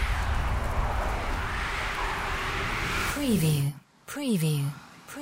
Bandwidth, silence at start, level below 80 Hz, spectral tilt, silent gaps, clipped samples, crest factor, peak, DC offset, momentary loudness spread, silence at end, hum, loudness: 16 kHz; 0 s; -34 dBFS; -5 dB/octave; none; under 0.1%; 14 dB; -14 dBFS; under 0.1%; 8 LU; 0 s; none; -29 LUFS